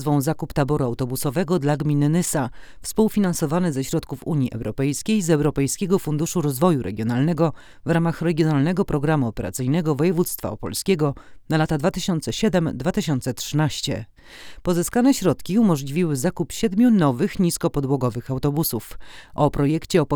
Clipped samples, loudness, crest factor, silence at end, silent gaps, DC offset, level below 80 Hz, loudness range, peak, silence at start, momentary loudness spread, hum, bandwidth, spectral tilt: under 0.1%; -22 LUFS; 16 dB; 0 s; none; under 0.1%; -44 dBFS; 2 LU; -4 dBFS; 0 s; 7 LU; none; over 20 kHz; -6 dB/octave